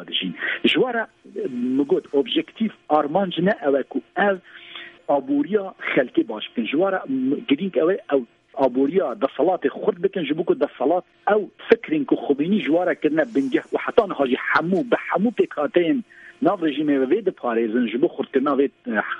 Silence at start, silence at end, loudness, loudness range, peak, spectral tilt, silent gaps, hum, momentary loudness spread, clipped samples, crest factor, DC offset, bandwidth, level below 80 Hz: 0 s; 0 s; -22 LUFS; 2 LU; 0 dBFS; -7.5 dB/octave; none; none; 5 LU; under 0.1%; 22 dB; under 0.1%; 7.2 kHz; -68 dBFS